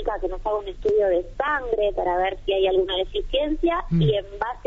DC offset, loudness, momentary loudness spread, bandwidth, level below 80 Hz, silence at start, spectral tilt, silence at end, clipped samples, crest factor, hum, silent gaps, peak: under 0.1%; -23 LUFS; 6 LU; 7.6 kHz; -36 dBFS; 0 s; -4.5 dB/octave; 0 s; under 0.1%; 14 dB; none; none; -10 dBFS